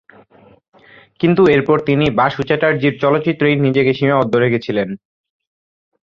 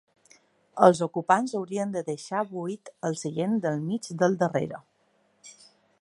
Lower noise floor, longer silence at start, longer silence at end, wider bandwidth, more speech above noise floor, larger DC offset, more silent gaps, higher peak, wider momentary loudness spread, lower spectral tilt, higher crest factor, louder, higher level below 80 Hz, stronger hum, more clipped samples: second, -47 dBFS vs -68 dBFS; first, 1.2 s vs 0.75 s; first, 1.05 s vs 0.5 s; second, 7.2 kHz vs 11.5 kHz; second, 33 dB vs 42 dB; neither; neither; about the same, -2 dBFS vs -2 dBFS; second, 7 LU vs 14 LU; first, -8.5 dB/octave vs -6 dB/octave; second, 14 dB vs 26 dB; first, -15 LUFS vs -27 LUFS; first, -50 dBFS vs -74 dBFS; neither; neither